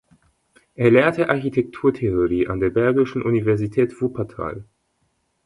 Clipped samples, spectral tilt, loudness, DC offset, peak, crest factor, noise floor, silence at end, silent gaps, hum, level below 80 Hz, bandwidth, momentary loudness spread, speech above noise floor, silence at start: under 0.1%; -8.5 dB/octave; -20 LUFS; under 0.1%; -2 dBFS; 18 dB; -69 dBFS; 0.8 s; none; none; -46 dBFS; 11 kHz; 12 LU; 49 dB; 0.8 s